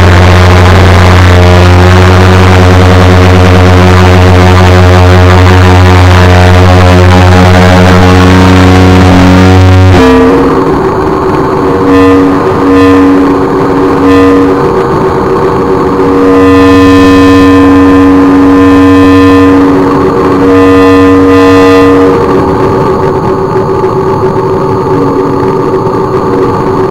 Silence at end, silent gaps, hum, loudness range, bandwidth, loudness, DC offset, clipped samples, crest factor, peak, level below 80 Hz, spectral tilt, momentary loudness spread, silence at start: 0 s; none; none; 4 LU; 13 kHz; -3 LUFS; 3%; 20%; 2 dB; 0 dBFS; -20 dBFS; -7 dB/octave; 6 LU; 0 s